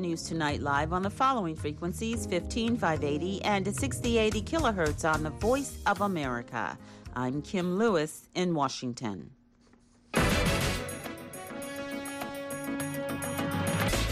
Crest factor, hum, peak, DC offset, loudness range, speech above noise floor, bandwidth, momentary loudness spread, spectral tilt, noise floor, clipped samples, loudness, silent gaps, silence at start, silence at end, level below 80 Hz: 16 dB; none; -16 dBFS; under 0.1%; 4 LU; 31 dB; 15.5 kHz; 10 LU; -5 dB/octave; -61 dBFS; under 0.1%; -30 LUFS; none; 0 s; 0 s; -44 dBFS